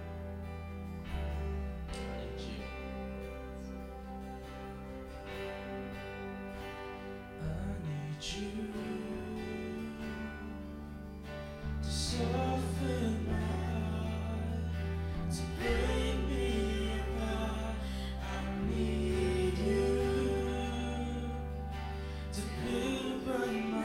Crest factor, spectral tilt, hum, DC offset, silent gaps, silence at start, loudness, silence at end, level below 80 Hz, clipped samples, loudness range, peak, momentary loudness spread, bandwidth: 16 dB; -6 dB/octave; none; under 0.1%; none; 0 s; -37 LUFS; 0 s; -42 dBFS; under 0.1%; 10 LU; -20 dBFS; 12 LU; 15.5 kHz